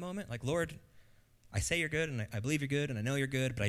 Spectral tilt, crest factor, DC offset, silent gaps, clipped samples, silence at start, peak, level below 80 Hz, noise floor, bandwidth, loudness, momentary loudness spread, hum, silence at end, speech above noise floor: -5 dB/octave; 18 dB; under 0.1%; none; under 0.1%; 0 s; -18 dBFS; -54 dBFS; -63 dBFS; 15.5 kHz; -35 LUFS; 8 LU; none; 0 s; 28 dB